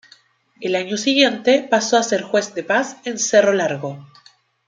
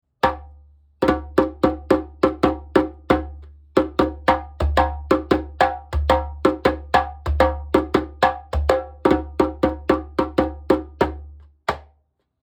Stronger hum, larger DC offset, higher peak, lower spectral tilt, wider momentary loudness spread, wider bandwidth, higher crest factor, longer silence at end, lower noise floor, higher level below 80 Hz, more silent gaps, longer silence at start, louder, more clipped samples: neither; neither; about the same, -2 dBFS vs -2 dBFS; second, -3 dB/octave vs -7 dB/octave; first, 12 LU vs 5 LU; second, 9.6 kHz vs 18 kHz; about the same, 18 dB vs 20 dB; about the same, 0.65 s vs 0.65 s; second, -53 dBFS vs -65 dBFS; second, -70 dBFS vs -32 dBFS; neither; first, 0.6 s vs 0.25 s; first, -18 LUFS vs -21 LUFS; neither